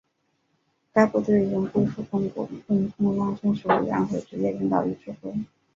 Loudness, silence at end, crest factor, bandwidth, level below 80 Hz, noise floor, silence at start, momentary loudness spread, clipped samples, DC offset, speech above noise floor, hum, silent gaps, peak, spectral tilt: -25 LUFS; 0.3 s; 22 dB; 7.4 kHz; -60 dBFS; -72 dBFS; 0.95 s; 11 LU; under 0.1%; under 0.1%; 48 dB; none; none; -4 dBFS; -8.5 dB/octave